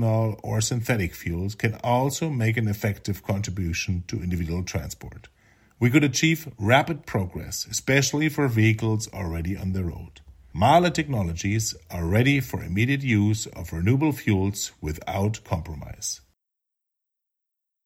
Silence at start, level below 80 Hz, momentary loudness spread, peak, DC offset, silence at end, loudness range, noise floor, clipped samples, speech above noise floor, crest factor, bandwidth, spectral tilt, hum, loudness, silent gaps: 0 s; -44 dBFS; 11 LU; -4 dBFS; under 0.1%; 1.7 s; 5 LU; -84 dBFS; under 0.1%; 60 dB; 22 dB; 16.5 kHz; -5 dB/octave; none; -25 LUFS; none